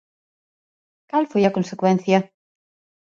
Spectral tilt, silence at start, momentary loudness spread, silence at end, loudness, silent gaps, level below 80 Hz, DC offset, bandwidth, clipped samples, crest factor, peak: -7 dB/octave; 1.15 s; 6 LU; 0.9 s; -20 LUFS; none; -66 dBFS; under 0.1%; 7.4 kHz; under 0.1%; 20 dB; -2 dBFS